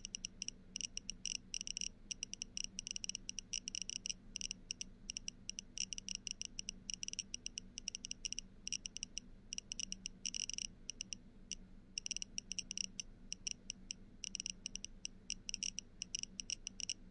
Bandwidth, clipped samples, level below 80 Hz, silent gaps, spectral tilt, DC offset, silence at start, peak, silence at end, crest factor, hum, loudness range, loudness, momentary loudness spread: 11.5 kHz; under 0.1%; -60 dBFS; none; 0.5 dB/octave; under 0.1%; 0 s; -22 dBFS; 0 s; 26 dB; none; 2 LU; -45 LUFS; 6 LU